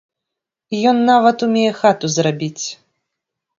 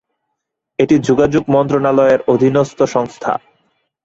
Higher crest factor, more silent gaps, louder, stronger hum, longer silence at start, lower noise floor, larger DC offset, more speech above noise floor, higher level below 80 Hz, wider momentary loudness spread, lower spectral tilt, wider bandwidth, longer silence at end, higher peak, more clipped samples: about the same, 18 dB vs 14 dB; neither; about the same, -16 LUFS vs -14 LUFS; neither; about the same, 0.7 s vs 0.8 s; first, -82 dBFS vs -75 dBFS; neither; first, 67 dB vs 62 dB; second, -64 dBFS vs -48 dBFS; first, 13 LU vs 9 LU; second, -4.5 dB/octave vs -7 dB/octave; about the same, 7.6 kHz vs 8 kHz; first, 0.85 s vs 0.65 s; about the same, 0 dBFS vs 0 dBFS; neither